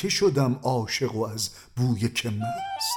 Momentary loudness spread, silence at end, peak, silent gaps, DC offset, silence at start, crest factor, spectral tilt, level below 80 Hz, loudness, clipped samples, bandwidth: 8 LU; 0 s; -10 dBFS; none; under 0.1%; 0 s; 16 dB; -4.5 dB/octave; -58 dBFS; -26 LUFS; under 0.1%; 18.5 kHz